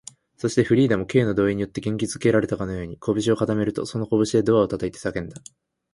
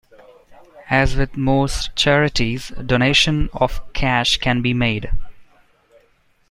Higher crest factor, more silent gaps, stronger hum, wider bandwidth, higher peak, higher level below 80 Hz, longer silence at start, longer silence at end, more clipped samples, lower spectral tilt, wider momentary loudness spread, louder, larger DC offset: about the same, 18 dB vs 18 dB; neither; neither; about the same, 11.5 kHz vs 12.5 kHz; second, -4 dBFS vs 0 dBFS; second, -50 dBFS vs -28 dBFS; about the same, 0.45 s vs 0.5 s; second, 0.55 s vs 1.05 s; neither; first, -6.5 dB/octave vs -4.5 dB/octave; about the same, 10 LU vs 8 LU; second, -23 LUFS vs -18 LUFS; neither